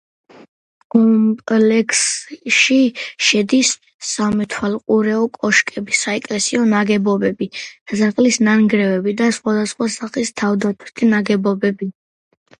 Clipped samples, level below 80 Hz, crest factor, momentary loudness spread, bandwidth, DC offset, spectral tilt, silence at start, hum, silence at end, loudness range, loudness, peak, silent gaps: under 0.1%; -58 dBFS; 16 dB; 9 LU; 11 kHz; under 0.1%; -3.5 dB/octave; 0.95 s; none; 0.7 s; 3 LU; -16 LUFS; 0 dBFS; 3.94-3.99 s, 7.81-7.86 s